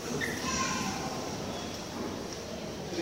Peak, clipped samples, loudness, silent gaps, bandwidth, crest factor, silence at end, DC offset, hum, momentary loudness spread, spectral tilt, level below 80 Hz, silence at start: -18 dBFS; under 0.1%; -34 LUFS; none; 16 kHz; 16 dB; 0 s; under 0.1%; none; 8 LU; -3.5 dB/octave; -54 dBFS; 0 s